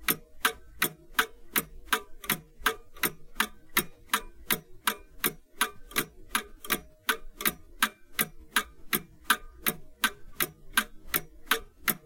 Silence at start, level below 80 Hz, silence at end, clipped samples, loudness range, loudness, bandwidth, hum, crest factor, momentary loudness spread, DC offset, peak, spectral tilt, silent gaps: 0 s; -52 dBFS; 0.1 s; under 0.1%; 1 LU; -31 LUFS; 17 kHz; none; 26 dB; 4 LU; under 0.1%; -6 dBFS; -1 dB/octave; none